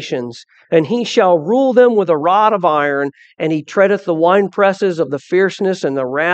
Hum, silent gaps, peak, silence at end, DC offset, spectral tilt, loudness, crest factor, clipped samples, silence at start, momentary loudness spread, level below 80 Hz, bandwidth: none; none; 0 dBFS; 0 s; under 0.1%; -6 dB/octave; -14 LUFS; 14 dB; under 0.1%; 0 s; 8 LU; -68 dBFS; 8.4 kHz